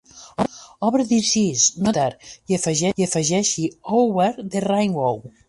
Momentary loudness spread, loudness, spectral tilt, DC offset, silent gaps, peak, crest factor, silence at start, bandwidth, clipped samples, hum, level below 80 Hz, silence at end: 9 LU; -20 LUFS; -4 dB/octave; under 0.1%; none; -4 dBFS; 16 dB; 0.15 s; 11.5 kHz; under 0.1%; none; -56 dBFS; 0.2 s